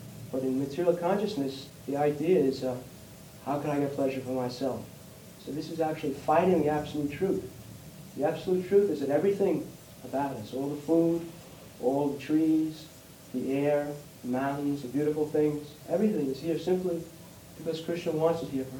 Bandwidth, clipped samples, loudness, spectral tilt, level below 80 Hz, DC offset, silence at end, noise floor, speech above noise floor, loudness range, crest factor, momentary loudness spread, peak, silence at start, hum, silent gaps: 19.5 kHz; under 0.1%; -30 LUFS; -7 dB/octave; -62 dBFS; under 0.1%; 0 s; -49 dBFS; 20 dB; 2 LU; 20 dB; 19 LU; -10 dBFS; 0 s; none; none